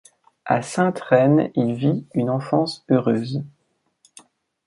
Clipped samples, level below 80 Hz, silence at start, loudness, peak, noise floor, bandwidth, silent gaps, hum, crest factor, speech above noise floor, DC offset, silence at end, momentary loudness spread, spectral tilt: under 0.1%; -64 dBFS; 0.45 s; -21 LUFS; -2 dBFS; -62 dBFS; 11.5 kHz; none; none; 18 dB; 42 dB; under 0.1%; 1.2 s; 10 LU; -7 dB/octave